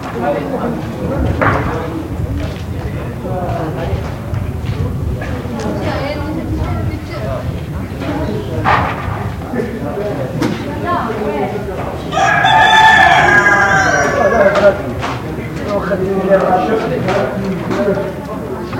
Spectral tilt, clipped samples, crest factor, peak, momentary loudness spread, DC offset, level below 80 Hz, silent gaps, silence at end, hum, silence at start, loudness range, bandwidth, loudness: -5.5 dB/octave; under 0.1%; 14 dB; 0 dBFS; 13 LU; under 0.1%; -30 dBFS; none; 0 s; none; 0 s; 11 LU; 17 kHz; -15 LUFS